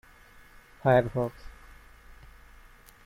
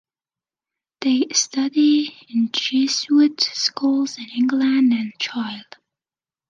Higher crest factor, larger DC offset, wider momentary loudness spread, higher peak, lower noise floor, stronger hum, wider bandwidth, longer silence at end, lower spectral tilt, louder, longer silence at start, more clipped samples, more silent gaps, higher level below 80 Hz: about the same, 20 dB vs 18 dB; neither; first, 27 LU vs 9 LU; second, -10 dBFS vs -4 dBFS; second, -54 dBFS vs under -90 dBFS; neither; first, 16 kHz vs 9.4 kHz; first, 1.55 s vs 0.85 s; first, -8 dB/octave vs -2 dB/octave; second, -27 LUFS vs -19 LUFS; second, 0.85 s vs 1 s; neither; neither; first, -52 dBFS vs -76 dBFS